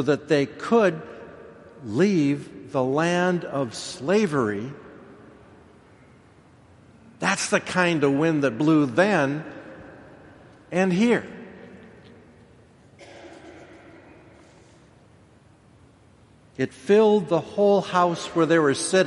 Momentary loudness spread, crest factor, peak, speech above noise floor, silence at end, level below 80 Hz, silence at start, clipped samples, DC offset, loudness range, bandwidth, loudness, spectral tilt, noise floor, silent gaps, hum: 23 LU; 20 dB; -4 dBFS; 33 dB; 0 s; -64 dBFS; 0 s; under 0.1%; under 0.1%; 7 LU; 11.5 kHz; -22 LUFS; -5.5 dB/octave; -54 dBFS; none; none